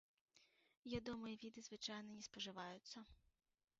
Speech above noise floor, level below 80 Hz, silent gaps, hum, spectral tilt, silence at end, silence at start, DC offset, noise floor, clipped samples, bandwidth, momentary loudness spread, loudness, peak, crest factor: 25 dB; -74 dBFS; 0.77-0.83 s; none; -3 dB/octave; 0.65 s; 0.35 s; under 0.1%; -77 dBFS; under 0.1%; 7.6 kHz; 10 LU; -52 LUFS; -34 dBFS; 22 dB